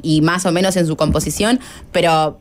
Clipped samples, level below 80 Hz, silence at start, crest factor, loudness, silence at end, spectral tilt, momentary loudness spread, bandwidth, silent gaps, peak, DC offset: under 0.1%; -34 dBFS; 0 s; 12 dB; -16 LUFS; 0.05 s; -5 dB/octave; 3 LU; 16 kHz; none; -4 dBFS; under 0.1%